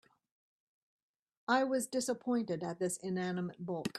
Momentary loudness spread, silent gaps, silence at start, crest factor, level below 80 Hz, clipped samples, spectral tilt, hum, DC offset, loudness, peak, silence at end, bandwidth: 8 LU; none; 1.5 s; 20 dB; -80 dBFS; under 0.1%; -4.5 dB/octave; none; under 0.1%; -36 LUFS; -16 dBFS; 0 s; 14 kHz